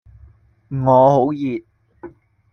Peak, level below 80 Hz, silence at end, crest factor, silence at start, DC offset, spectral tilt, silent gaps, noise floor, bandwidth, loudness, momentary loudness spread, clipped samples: -2 dBFS; -52 dBFS; 0.45 s; 16 dB; 0.7 s; under 0.1%; -9.5 dB/octave; none; -49 dBFS; 6.6 kHz; -16 LUFS; 17 LU; under 0.1%